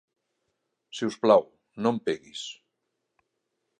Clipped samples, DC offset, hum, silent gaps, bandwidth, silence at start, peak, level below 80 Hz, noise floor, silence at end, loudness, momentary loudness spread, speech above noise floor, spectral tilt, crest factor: under 0.1%; under 0.1%; none; none; 10.5 kHz; 0.95 s; -6 dBFS; -74 dBFS; -81 dBFS; 1.3 s; -26 LUFS; 19 LU; 55 dB; -5 dB/octave; 24 dB